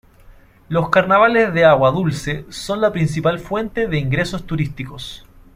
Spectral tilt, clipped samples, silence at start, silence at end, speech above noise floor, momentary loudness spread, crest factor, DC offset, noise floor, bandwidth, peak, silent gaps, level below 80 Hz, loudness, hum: -6 dB/octave; under 0.1%; 0.3 s; 0.35 s; 28 dB; 14 LU; 16 dB; under 0.1%; -45 dBFS; 15.5 kHz; -2 dBFS; none; -42 dBFS; -17 LUFS; none